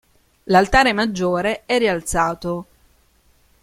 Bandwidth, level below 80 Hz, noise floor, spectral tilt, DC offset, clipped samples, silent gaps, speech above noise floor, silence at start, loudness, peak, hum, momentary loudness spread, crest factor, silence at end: 16 kHz; -38 dBFS; -57 dBFS; -4.5 dB/octave; under 0.1%; under 0.1%; none; 39 dB; 0.45 s; -18 LUFS; -2 dBFS; none; 11 LU; 18 dB; 1 s